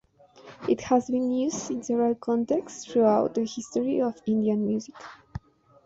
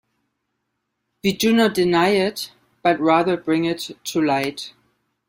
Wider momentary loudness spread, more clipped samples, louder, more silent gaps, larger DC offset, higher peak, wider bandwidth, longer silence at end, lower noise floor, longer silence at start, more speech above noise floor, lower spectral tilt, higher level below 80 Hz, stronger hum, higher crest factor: first, 18 LU vs 12 LU; neither; second, -26 LUFS vs -20 LUFS; neither; neither; second, -10 dBFS vs -4 dBFS; second, 8 kHz vs 16 kHz; about the same, 0.5 s vs 0.6 s; second, -51 dBFS vs -76 dBFS; second, 0.45 s vs 1.25 s; second, 26 dB vs 57 dB; about the same, -6 dB/octave vs -5 dB/octave; about the same, -60 dBFS vs -60 dBFS; neither; about the same, 18 dB vs 18 dB